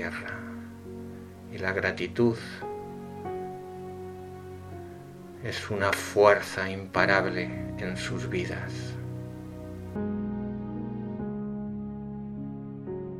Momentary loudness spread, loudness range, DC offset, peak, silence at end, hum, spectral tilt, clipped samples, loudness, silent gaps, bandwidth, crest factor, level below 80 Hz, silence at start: 18 LU; 9 LU; under 0.1%; -4 dBFS; 0 s; none; -5.5 dB/octave; under 0.1%; -30 LUFS; none; 16 kHz; 26 dB; -54 dBFS; 0 s